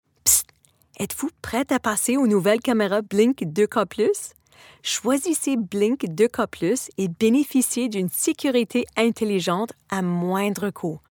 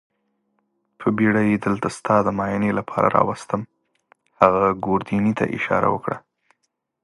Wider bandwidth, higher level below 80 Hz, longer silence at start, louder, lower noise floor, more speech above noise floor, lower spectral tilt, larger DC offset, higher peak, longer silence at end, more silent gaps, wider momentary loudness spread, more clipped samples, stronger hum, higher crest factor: first, 19 kHz vs 11.5 kHz; about the same, -58 dBFS vs -54 dBFS; second, 0.25 s vs 1 s; about the same, -22 LUFS vs -21 LUFS; second, -59 dBFS vs -74 dBFS; second, 37 dB vs 54 dB; second, -4 dB/octave vs -7.5 dB/octave; neither; second, -4 dBFS vs 0 dBFS; second, 0.15 s vs 0.85 s; neither; about the same, 9 LU vs 9 LU; neither; neither; about the same, 20 dB vs 22 dB